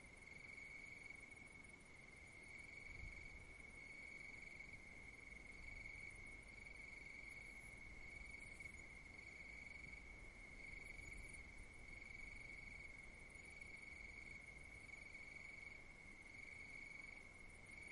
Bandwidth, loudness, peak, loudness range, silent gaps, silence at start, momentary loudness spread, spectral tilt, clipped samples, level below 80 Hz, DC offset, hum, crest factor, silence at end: 11.5 kHz; -56 LUFS; -42 dBFS; 1 LU; none; 0 s; 4 LU; -3.5 dB/octave; under 0.1%; -66 dBFS; under 0.1%; none; 16 dB; 0 s